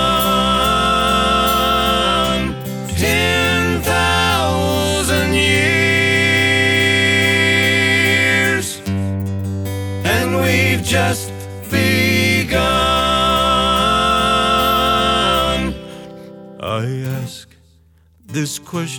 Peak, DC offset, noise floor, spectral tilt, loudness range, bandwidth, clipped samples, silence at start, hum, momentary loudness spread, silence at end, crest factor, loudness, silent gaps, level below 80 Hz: -2 dBFS; under 0.1%; -51 dBFS; -4 dB/octave; 5 LU; over 20 kHz; under 0.1%; 0 s; none; 11 LU; 0 s; 14 dB; -15 LUFS; none; -32 dBFS